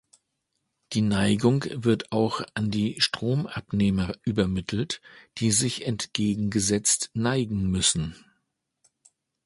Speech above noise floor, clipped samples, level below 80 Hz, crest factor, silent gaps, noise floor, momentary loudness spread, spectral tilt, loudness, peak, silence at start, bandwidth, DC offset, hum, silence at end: 53 dB; under 0.1%; -48 dBFS; 20 dB; none; -78 dBFS; 7 LU; -4.5 dB/octave; -25 LUFS; -6 dBFS; 0.9 s; 11.5 kHz; under 0.1%; none; 1.3 s